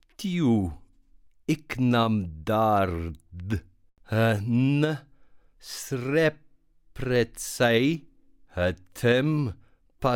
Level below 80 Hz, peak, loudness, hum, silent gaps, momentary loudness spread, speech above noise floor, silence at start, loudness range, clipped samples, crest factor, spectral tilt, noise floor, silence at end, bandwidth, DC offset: -48 dBFS; -10 dBFS; -26 LUFS; none; none; 12 LU; 33 dB; 0.2 s; 2 LU; under 0.1%; 16 dB; -6 dB/octave; -58 dBFS; 0 s; 17.5 kHz; under 0.1%